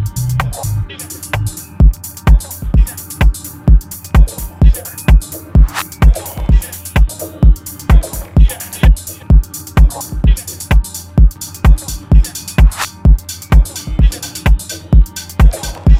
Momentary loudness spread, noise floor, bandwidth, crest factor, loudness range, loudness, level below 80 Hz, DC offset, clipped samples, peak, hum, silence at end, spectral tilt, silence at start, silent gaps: 5 LU; -27 dBFS; 16 kHz; 10 dB; 1 LU; -14 LUFS; -12 dBFS; under 0.1%; 0.3%; 0 dBFS; none; 0 s; -5.5 dB/octave; 0 s; none